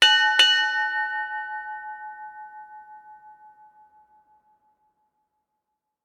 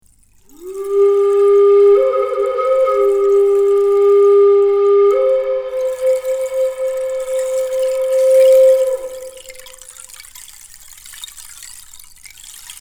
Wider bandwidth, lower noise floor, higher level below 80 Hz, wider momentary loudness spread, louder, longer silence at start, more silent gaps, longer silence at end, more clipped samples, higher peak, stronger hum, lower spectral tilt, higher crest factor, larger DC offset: about the same, 18 kHz vs 17.5 kHz; first, -81 dBFS vs -50 dBFS; second, -80 dBFS vs -54 dBFS; first, 27 LU vs 24 LU; second, -20 LUFS vs -13 LUFS; second, 0 s vs 0.6 s; neither; first, 2.7 s vs 0.1 s; neither; about the same, -4 dBFS vs -2 dBFS; neither; second, 3.5 dB/octave vs -3 dB/octave; first, 22 dB vs 12 dB; neither